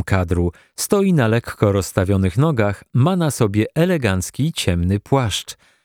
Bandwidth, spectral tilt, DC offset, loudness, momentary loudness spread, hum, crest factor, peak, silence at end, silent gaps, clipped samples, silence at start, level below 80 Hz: 19 kHz; -6 dB/octave; under 0.1%; -19 LUFS; 5 LU; none; 18 dB; 0 dBFS; 0.3 s; none; under 0.1%; 0 s; -40 dBFS